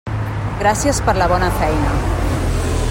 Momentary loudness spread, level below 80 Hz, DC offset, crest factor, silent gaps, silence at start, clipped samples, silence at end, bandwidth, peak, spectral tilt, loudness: 5 LU; -24 dBFS; under 0.1%; 14 dB; none; 0.05 s; under 0.1%; 0 s; 16.5 kHz; -2 dBFS; -5.5 dB/octave; -18 LUFS